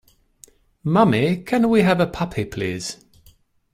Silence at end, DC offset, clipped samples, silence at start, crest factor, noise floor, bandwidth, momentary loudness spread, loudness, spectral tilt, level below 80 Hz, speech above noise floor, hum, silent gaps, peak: 0.8 s; under 0.1%; under 0.1%; 0.85 s; 18 dB; -55 dBFS; 15.5 kHz; 14 LU; -20 LUFS; -6.5 dB/octave; -50 dBFS; 36 dB; none; none; -2 dBFS